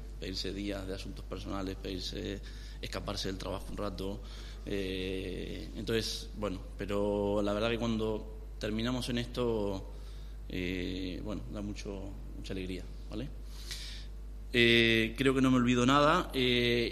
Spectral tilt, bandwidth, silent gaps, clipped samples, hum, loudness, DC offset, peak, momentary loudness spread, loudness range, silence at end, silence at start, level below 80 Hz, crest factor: -5 dB/octave; 13.5 kHz; none; under 0.1%; none; -33 LUFS; under 0.1%; -10 dBFS; 17 LU; 12 LU; 0 s; 0 s; -44 dBFS; 22 dB